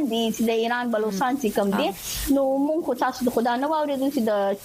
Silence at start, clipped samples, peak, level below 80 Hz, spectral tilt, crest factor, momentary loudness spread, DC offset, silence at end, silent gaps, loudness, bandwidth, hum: 0 s; under 0.1%; -10 dBFS; -48 dBFS; -4.5 dB/octave; 14 dB; 3 LU; under 0.1%; 0 s; none; -24 LUFS; 15.5 kHz; none